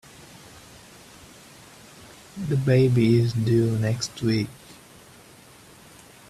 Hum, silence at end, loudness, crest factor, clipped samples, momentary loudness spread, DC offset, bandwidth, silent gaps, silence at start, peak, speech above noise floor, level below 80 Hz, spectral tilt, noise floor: none; 1.75 s; -22 LUFS; 18 dB; under 0.1%; 27 LU; under 0.1%; 13.5 kHz; none; 2.35 s; -8 dBFS; 28 dB; -56 dBFS; -7 dB/octave; -49 dBFS